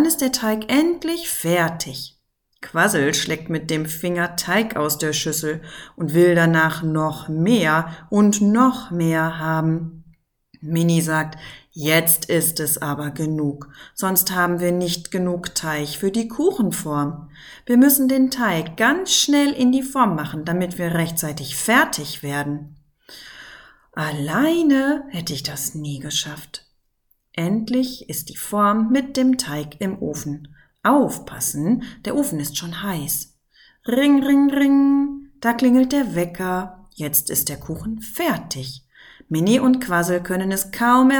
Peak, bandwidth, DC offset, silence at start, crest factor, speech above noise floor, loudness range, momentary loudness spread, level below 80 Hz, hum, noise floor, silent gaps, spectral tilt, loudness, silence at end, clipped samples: -2 dBFS; 19.5 kHz; under 0.1%; 0 s; 20 dB; 46 dB; 5 LU; 13 LU; -52 dBFS; none; -66 dBFS; none; -4.5 dB/octave; -20 LUFS; 0 s; under 0.1%